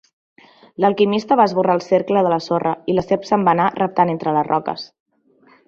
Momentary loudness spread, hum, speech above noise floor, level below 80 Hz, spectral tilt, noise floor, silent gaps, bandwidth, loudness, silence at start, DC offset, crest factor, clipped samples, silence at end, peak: 6 LU; none; 37 dB; -58 dBFS; -7 dB/octave; -54 dBFS; none; 7.4 kHz; -18 LUFS; 0.8 s; under 0.1%; 16 dB; under 0.1%; 0.8 s; -2 dBFS